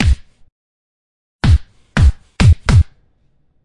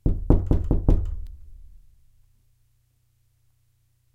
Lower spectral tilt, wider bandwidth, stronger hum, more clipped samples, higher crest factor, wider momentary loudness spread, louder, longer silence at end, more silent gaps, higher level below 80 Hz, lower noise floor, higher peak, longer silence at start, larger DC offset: second, -6.5 dB/octave vs -11 dB/octave; first, 11 kHz vs 2.9 kHz; neither; neither; second, 14 dB vs 24 dB; second, 10 LU vs 21 LU; first, -15 LUFS vs -24 LUFS; second, 0.8 s vs 2.35 s; first, 0.52-1.39 s vs none; first, -20 dBFS vs -28 dBFS; second, -56 dBFS vs -65 dBFS; about the same, 0 dBFS vs -2 dBFS; about the same, 0 s vs 0.05 s; neither